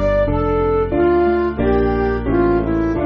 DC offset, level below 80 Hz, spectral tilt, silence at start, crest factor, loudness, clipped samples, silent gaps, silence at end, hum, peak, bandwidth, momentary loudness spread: under 0.1%; -26 dBFS; -7.5 dB/octave; 0 s; 12 dB; -17 LUFS; under 0.1%; none; 0 s; none; -4 dBFS; 5.8 kHz; 3 LU